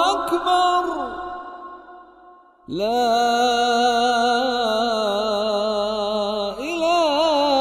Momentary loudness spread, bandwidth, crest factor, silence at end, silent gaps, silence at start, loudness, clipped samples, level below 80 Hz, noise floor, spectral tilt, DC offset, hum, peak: 13 LU; 14 kHz; 14 dB; 0 s; none; 0 s; -20 LUFS; under 0.1%; -54 dBFS; -49 dBFS; -3 dB/octave; under 0.1%; none; -6 dBFS